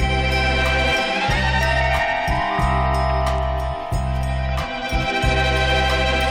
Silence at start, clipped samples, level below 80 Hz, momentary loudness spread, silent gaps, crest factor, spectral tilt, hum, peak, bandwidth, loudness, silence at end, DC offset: 0 s; under 0.1%; -24 dBFS; 6 LU; none; 12 dB; -5 dB/octave; none; -6 dBFS; 14.5 kHz; -20 LUFS; 0 s; under 0.1%